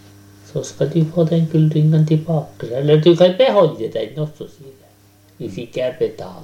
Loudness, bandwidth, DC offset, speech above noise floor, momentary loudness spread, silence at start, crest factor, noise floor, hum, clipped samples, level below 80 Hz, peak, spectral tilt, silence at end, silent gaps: -17 LUFS; 8.6 kHz; under 0.1%; 34 dB; 16 LU; 0.55 s; 16 dB; -50 dBFS; none; under 0.1%; -56 dBFS; 0 dBFS; -7.5 dB/octave; 0 s; none